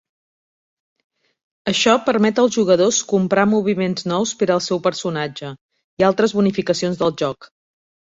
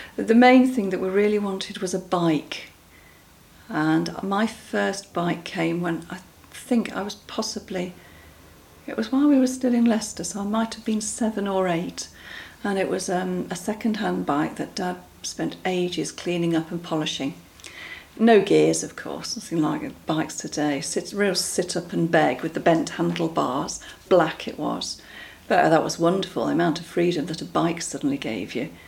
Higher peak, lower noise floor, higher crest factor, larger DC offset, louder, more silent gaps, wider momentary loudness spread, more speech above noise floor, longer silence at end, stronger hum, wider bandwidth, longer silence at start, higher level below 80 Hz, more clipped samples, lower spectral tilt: about the same, -2 dBFS vs -4 dBFS; first, under -90 dBFS vs -51 dBFS; about the same, 18 dB vs 20 dB; neither; first, -18 LUFS vs -24 LUFS; first, 5.61-5.69 s, 5.84-5.97 s vs none; second, 10 LU vs 13 LU; first, over 72 dB vs 28 dB; first, 0.65 s vs 0 s; neither; second, 7.8 kHz vs 16.5 kHz; first, 1.65 s vs 0 s; about the same, -60 dBFS vs -58 dBFS; neither; about the same, -4.5 dB/octave vs -5 dB/octave